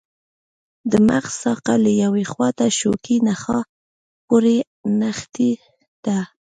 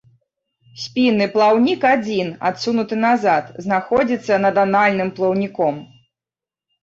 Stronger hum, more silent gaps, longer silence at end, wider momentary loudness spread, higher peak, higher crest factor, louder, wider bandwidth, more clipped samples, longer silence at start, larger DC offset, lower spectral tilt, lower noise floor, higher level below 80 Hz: neither; first, 3.69-4.28 s, 4.67-4.84 s, 5.88-6.03 s vs none; second, 0.3 s vs 1 s; about the same, 8 LU vs 7 LU; about the same, -2 dBFS vs -4 dBFS; about the same, 18 dB vs 16 dB; about the same, -19 LUFS vs -18 LUFS; first, 9.4 kHz vs 7.6 kHz; neither; about the same, 0.85 s vs 0.75 s; neither; about the same, -5 dB/octave vs -6 dB/octave; about the same, under -90 dBFS vs -90 dBFS; about the same, -56 dBFS vs -60 dBFS